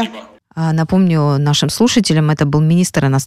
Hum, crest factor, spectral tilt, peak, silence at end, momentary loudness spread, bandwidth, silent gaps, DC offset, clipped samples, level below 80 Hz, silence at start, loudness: none; 12 dB; -5.5 dB/octave; -2 dBFS; 0 s; 6 LU; 14 kHz; none; under 0.1%; under 0.1%; -44 dBFS; 0 s; -14 LUFS